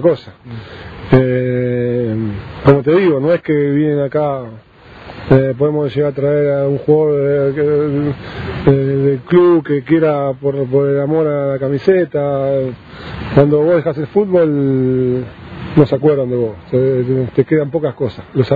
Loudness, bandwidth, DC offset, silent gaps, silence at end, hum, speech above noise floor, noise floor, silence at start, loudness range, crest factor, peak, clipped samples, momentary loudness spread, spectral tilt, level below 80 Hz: -14 LUFS; 5 kHz; under 0.1%; none; 0 s; none; 22 dB; -35 dBFS; 0 s; 2 LU; 14 dB; 0 dBFS; under 0.1%; 12 LU; -10.5 dB/octave; -42 dBFS